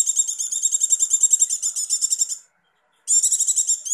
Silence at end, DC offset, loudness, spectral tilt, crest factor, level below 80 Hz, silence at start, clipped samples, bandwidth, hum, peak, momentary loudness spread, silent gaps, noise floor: 0 s; under 0.1%; -17 LUFS; 7 dB/octave; 16 dB; under -90 dBFS; 0 s; under 0.1%; 14.5 kHz; none; -6 dBFS; 7 LU; none; -65 dBFS